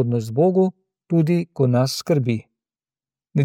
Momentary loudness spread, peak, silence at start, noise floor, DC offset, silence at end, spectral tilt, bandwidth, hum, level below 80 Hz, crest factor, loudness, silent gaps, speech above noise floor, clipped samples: 7 LU; -6 dBFS; 0 s; under -90 dBFS; under 0.1%; 0 s; -7 dB/octave; 16.5 kHz; none; -66 dBFS; 16 dB; -20 LUFS; none; over 71 dB; under 0.1%